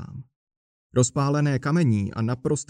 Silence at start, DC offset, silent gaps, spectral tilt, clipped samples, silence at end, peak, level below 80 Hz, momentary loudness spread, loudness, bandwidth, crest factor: 0 s; under 0.1%; 0.36-0.47 s, 0.57-0.90 s; -6 dB/octave; under 0.1%; 0.05 s; -6 dBFS; -56 dBFS; 9 LU; -23 LUFS; 10 kHz; 18 dB